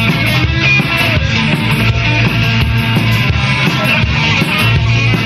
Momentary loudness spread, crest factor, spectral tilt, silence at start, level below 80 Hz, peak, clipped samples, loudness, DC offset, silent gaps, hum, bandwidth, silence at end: 2 LU; 12 dB; -5.5 dB/octave; 0 s; -24 dBFS; 0 dBFS; under 0.1%; -11 LUFS; under 0.1%; none; none; 14 kHz; 0 s